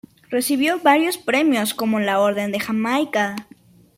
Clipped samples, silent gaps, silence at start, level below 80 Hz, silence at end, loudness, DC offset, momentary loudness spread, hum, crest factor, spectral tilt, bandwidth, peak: under 0.1%; none; 0.3 s; -64 dBFS; 0.55 s; -19 LUFS; under 0.1%; 7 LU; none; 18 dB; -4 dB/octave; 16.5 kHz; -4 dBFS